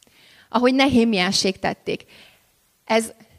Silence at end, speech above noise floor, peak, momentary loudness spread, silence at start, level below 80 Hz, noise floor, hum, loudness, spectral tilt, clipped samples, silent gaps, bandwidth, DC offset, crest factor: 0.3 s; 42 dB; -4 dBFS; 12 LU; 0.55 s; -54 dBFS; -62 dBFS; none; -20 LUFS; -4 dB/octave; under 0.1%; none; 15 kHz; under 0.1%; 18 dB